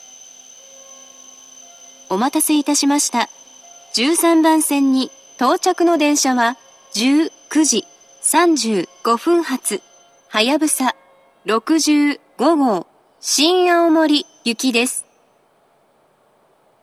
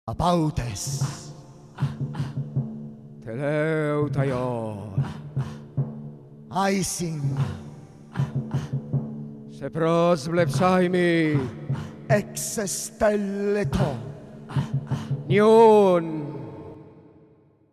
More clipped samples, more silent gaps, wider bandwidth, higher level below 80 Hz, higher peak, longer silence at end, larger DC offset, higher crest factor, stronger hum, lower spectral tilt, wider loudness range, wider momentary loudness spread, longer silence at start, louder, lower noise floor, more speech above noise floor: neither; neither; about the same, 14.5 kHz vs 14 kHz; second, -80 dBFS vs -48 dBFS; first, 0 dBFS vs -6 dBFS; first, 1.8 s vs 0.75 s; neither; about the same, 18 dB vs 18 dB; neither; second, -2 dB/octave vs -6 dB/octave; second, 3 LU vs 7 LU; second, 9 LU vs 17 LU; first, 0.9 s vs 0.05 s; first, -17 LUFS vs -24 LUFS; about the same, -57 dBFS vs -56 dBFS; first, 42 dB vs 34 dB